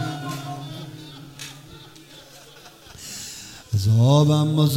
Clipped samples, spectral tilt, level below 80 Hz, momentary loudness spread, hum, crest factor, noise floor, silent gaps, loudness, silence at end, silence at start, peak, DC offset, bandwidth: under 0.1%; -6.5 dB/octave; -56 dBFS; 27 LU; none; 18 dB; -46 dBFS; none; -21 LUFS; 0 s; 0 s; -6 dBFS; under 0.1%; 16 kHz